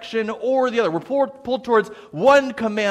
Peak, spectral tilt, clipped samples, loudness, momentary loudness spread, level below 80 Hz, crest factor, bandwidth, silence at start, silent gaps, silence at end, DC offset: -2 dBFS; -5 dB/octave; under 0.1%; -20 LUFS; 9 LU; -60 dBFS; 18 dB; 11 kHz; 0 s; none; 0 s; under 0.1%